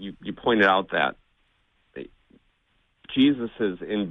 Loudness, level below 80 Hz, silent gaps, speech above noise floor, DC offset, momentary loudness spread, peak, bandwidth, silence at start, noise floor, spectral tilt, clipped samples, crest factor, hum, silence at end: -23 LUFS; -58 dBFS; none; 45 dB; under 0.1%; 22 LU; -6 dBFS; 5.8 kHz; 0 s; -68 dBFS; -7 dB/octave; under 0.1%; 20 dB; none; 0 s